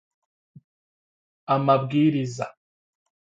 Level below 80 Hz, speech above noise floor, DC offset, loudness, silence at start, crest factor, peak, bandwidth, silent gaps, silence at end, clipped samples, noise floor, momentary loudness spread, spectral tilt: -68 dBFS; over 68 dB; under 0.1%; -23 LUFS; 1.5 s; 20 dB; -6 dBFS; 8 kHz; none; 0.85 s; under 0.1%; under -90 dBFS; 15 LU; -7.5 dB/octave